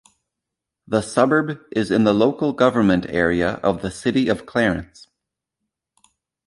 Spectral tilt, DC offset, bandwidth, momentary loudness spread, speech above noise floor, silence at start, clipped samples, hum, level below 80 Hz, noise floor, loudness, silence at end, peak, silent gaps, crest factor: -6 dB/octave; under 0.1%; 11.5 kHz; 7 LU; 64 dB; 0.9 s; under 0.1%; none; -48 dBFS; -83 dBFS; -20 LUFS; 1.6 s; -2 dBFS; none; 20 dB